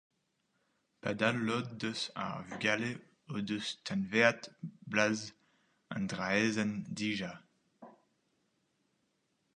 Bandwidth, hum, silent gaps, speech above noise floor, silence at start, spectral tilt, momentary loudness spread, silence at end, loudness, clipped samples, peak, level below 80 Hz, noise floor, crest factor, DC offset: 10.5 kHz; none; none; 45 dB; 1.05 s; -4.5 dB/octave; 14 LU; 1.65 s; -34 LUFS; under 0.1%; -10 dBFS; -72 dBFS; -79 dBFS; 26 dB; under 0.1%